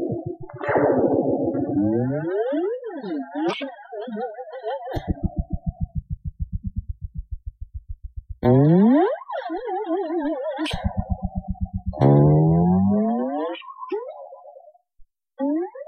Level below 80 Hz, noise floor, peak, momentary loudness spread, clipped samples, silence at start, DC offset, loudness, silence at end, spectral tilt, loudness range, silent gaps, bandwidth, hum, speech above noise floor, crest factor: -36 dBFS; -51 dBFS; -4 dBFS; 19 LU; under 0.1%; 0 s; under 0.1%; -23 LUFS; 0.05 s; -8 dB/octave; 10 LU; none; 5.8 kHz; none; 31 dB; 18 dB